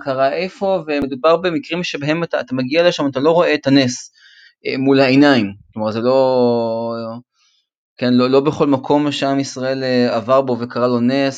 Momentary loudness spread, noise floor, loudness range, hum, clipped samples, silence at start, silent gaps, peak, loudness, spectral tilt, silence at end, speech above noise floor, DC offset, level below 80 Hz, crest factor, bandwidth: 9 LU; -61 dBFS; 2 LU; none; under 0.1%; 0 s; 7.77-7.96 s; 0 dBFS; -16 LUFS; -5.5 dB/octave; 0 s; 46 dB; under 0.1%; -56 dBFS; 16 dB; 9 kHz